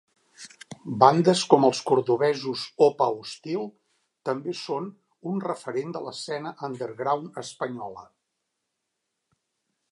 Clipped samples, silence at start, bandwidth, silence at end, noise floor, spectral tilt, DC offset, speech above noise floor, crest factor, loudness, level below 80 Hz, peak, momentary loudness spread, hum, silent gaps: under 0.1%; 0.4 s; 11.5 kHz; 1.9 s; -81 dBFS; -5.5 dB/octave; under 0.1%; 56 dB; 24 dB; -25 LUFS; -74 dBFS; -2 dBFS; 20 LU; none; none